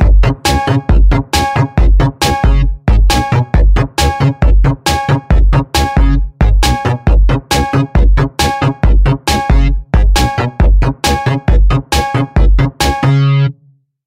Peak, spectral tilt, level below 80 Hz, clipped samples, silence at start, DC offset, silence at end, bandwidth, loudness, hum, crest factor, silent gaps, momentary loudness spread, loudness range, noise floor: 0 dBFS; -5.5 dB/octave; -12 dBFS; under 0.1%; 0 s; under 0.1%; 0.55 s; 15.5 kHz; -12 LUFS; none; 10 dB; none; 3 LU; 1 LU; -49 dBFS